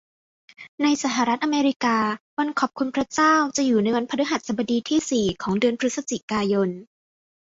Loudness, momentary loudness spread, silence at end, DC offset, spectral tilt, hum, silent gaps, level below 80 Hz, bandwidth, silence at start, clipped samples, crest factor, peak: -23 LUFS; 6 LU; 0.75 s; under 0.1%; -4 dB/octave; none; 0.68-0.78 s, 1.76-1.80 s, 2.21-2.37 s, 6.23-6.28 s; -60 dBFS; 8 kHz; 0.6 s; under 0.1%; 16 dB; -6 dBFS